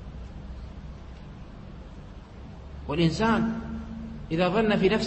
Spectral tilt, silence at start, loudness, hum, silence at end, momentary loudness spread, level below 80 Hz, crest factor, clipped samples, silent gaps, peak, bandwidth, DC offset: -6.5 dB/octave; 0 s; -26 LUFS; none; 0 s; 21 LU; -42 dBFS; 18 dB; under 0.1%; none; -10 dBFS; 8.6 kHz; under 0.1%